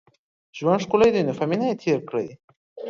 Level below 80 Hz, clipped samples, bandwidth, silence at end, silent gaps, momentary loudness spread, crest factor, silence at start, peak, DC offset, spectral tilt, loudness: -60 dBFS; under 0.1%; 7.6 kHz; 0 s; 2.44-2.48 s, 2.56-2.76 s; 11 LU; 18 dB; 0.55 s; -4 dBFS; under 0.1%; -6.5 dB/octave; -22 LUFS